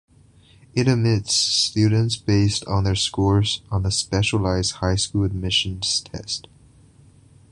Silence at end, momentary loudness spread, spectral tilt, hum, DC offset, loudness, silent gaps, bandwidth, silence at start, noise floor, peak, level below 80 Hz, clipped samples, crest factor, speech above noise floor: 1.1 s; 6 LU; -4.5 dB/octave; none; under 0.1%; -21 LUFS; none; 11.5 kHz; 0.75 s; -52 dBFS; -4 dBFS; -38 dBFS; under 0.1%; 18 dB; 31 dB